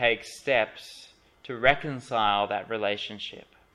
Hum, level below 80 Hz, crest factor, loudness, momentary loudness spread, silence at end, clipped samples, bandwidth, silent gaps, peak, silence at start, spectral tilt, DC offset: none; -56 dBFS; 24 dB; -27 LUFS; 16 LU; 0.35 s; under 0.1%; 13 kHz; none; -4 dBFS; 0 s; -4 dB/octave; under 0.1%